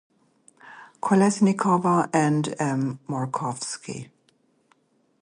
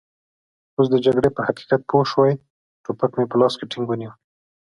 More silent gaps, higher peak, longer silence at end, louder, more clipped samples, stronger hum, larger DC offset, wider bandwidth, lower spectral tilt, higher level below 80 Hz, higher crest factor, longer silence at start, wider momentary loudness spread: second, none vs 2.50-2.84 s; second, -6 dBFS vs -2 dBFS; first, 1.2 s vs 0.55 s; second, -23 LUFS vs -20 LUFS; neither; neither; neither; about the same, 10.5 kHz vs 11 kHz; about the same, -6 dB/octave vs -7 dB/octave; second, -70 dBFS vs -56 dBFS; about the same, 20 dB vs 18 dB; second, 0.65 s vs 0.8 s; about the same, 12 LU vs 13 LU